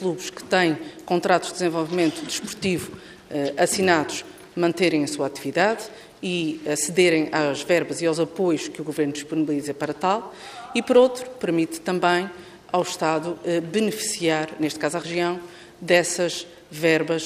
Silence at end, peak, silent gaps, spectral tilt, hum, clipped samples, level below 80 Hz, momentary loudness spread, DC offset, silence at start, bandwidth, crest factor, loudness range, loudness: 0 s; -4 dBFS; none; -4 dB/octave; none; under 0.1%; -64 dBFS; 12 LU; under 0.1%; 0 s; 15.5 kHz; 20 dB; 2 LU; -23 LUFS